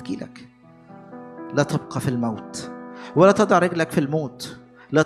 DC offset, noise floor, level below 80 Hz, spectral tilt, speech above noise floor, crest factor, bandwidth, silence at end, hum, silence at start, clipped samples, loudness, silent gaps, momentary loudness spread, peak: under 0.1%; -46 dBFS; -62 dBFS; -6 dB/octave; 25 dB; 20 dB; 13.5 kHz; 0 s; none; 0 s; under 0.1%; -21 LUFS; none; 22 LU; -2 dBFS